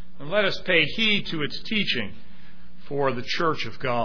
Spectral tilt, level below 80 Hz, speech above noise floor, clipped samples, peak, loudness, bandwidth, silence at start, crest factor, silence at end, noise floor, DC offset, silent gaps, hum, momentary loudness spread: -5 dB/octave; -52 dBFS; 25 dB; under 0.1%; -6 dBFS; -24 LUFS; 5.4 kHz; 0.2 s; 20 dB; 0 s; -50 dBFS; 4%; none; none; 9 LU